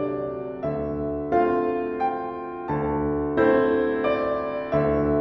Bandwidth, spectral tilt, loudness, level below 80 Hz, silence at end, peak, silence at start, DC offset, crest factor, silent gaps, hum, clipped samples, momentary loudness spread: 5.8 kHz; -10 dB/octave; -24 LUFS; -44 dBFS; 0 s; -8 dBFS; 0 s; under 0.1%; 16 dB; none; none; under 0.1%; 9 LU